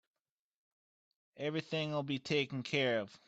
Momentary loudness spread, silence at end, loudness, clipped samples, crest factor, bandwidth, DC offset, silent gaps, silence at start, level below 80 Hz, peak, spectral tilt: 6 LU; 0.1 s; -36 LUFS; under 0.1%; 20 dB; 8.2 kHz; under 0.1%; none; 1.35 s; -78 dBFS; -20 dBFS; -5.5 dB/octave